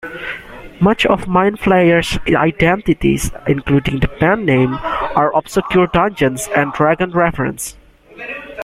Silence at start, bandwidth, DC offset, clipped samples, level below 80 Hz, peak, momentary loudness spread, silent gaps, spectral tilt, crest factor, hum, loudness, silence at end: 0.05 s; 15.5 kHz; under 0.1%; under 0.1%; -34 dBFS; 0 dBFS; 13 LU; none; -5.5 dB/octave; 14 dB; none; -15 LUFS; 0 s